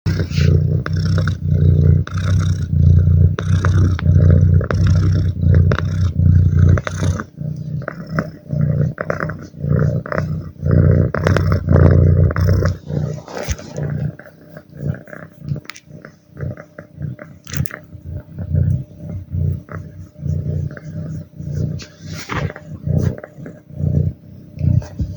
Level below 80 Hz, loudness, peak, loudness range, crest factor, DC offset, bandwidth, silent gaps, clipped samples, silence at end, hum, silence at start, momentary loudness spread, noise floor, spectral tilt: -28 dBFS; -17 LUFS; 0 dBFS; 13 LU; 16 dB; under 0.1%; over 20 kHz; none; under 0.1%; 0 s; none; 0.05 s; 18 LU; -40 dBFS; -8 dB/octave